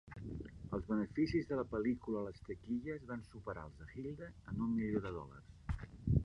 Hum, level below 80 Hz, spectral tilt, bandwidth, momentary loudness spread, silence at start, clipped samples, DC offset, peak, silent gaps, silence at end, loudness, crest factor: none; -52 dBFS; -9 dB/octave; 9.8 kHz; 13 LU; 0.05 s; under 0.1%; under 0.1%; -20 dBFS; none; 0 s; -42 LUFS; 20 dB